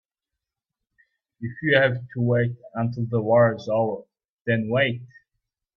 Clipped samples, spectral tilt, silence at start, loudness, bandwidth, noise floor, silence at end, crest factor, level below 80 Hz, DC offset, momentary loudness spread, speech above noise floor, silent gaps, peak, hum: under 0.1%; -8.5 dB/octave; 1.4 s; -23 LUFS; 6.4 kHz; -87 dBFS; 0.7 s; 20 dB; -62 dBFS; under 0.1%; 15 LU; 64 dB; 4.30-4.38 s; -4 dBFS; none